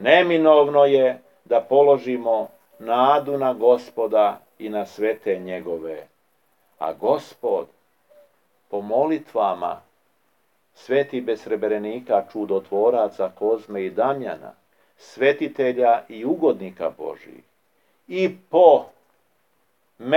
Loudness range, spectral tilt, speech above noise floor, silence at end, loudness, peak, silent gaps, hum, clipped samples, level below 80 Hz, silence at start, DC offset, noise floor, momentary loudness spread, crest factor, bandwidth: 7 LU; -6.5 dB/octave; 48 dB; 0 s; -21 LUFS; 0 dBFS; none; none; under 0.1%; -80 dBFS; 0 s; under 0.1%; -68 dBFS; 16 LU; 20 dB; 12.5 kHz